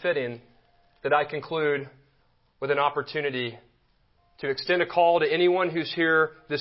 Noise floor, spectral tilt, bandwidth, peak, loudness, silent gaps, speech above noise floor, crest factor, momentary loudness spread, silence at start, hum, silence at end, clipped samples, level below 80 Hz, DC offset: -65 dBFS; -9 dB/octave; 5.8 kHz; -8 dBFS; -25 LUFS; none; 40 dB; 18 dB; 13 LU; 0 s; none; 0 s; under 0.1%; -68 dBFS; under 0.1%